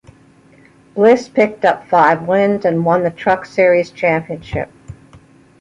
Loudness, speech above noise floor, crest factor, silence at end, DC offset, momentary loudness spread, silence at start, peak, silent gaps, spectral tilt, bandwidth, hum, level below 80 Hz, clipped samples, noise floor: -15 LUFS; 33 dB; 14 dB; 0.65 s; under 0.1%; 12 LU; 0.95 s; 0 dBFS; none; -7 dB/octave; 10 kHz; none; -48 dBFS; under 0.1%; -47 dBFS